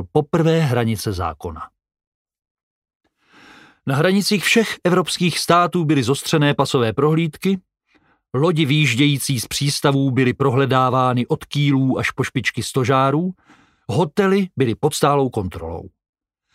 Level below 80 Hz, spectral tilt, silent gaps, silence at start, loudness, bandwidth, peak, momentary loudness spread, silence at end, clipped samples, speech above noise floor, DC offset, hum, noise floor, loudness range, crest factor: -50 dBFS; -5.5 dB/octave; 2.07-2.25 s, 2.51-2.55 s, 2.63-2.82 s, 2.95-3.00 s; 0 s; -18 LUFS; 16 kHz; 0 dBFS; 10 LU; 0.65 s; under 0.1%; 42 dB; under 0.1%; none; -60 dBFS; 6 LU; 18 dB